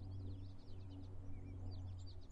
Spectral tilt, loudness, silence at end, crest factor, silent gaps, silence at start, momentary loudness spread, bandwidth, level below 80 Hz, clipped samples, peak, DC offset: -8 dB/octave; -53 LUFS; 0 s; 10 dB; none; 0 s; 4 LU; 8 kHz; -56 dBFS; under 0.1%; -38 dBFS; under 0.1%